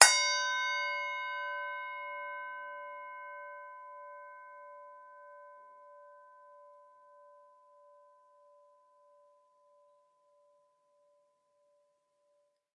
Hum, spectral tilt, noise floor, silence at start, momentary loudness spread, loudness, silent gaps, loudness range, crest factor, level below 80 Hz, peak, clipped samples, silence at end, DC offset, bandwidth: none; 5 dB/octave; -75 dBFS; 0 s; 25 LU; -33 LUFS; none; 25 LU; 38 dB; under -90 dBFS; 0 dBFS; under 0.1%; 6.05 s; under 0.1%; 10.5 kHz